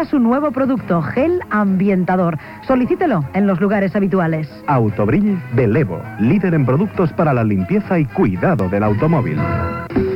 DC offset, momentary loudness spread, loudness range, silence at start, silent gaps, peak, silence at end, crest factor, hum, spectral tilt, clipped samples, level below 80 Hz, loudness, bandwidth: under 0.1%; 4 LU; 1 LU; 0 s; none; -4 dBFS; 0 s; 12 dB; none; -10 dB/octave; under 0.1%; -40 dBFS; -17 LUFS; 5.6 kHz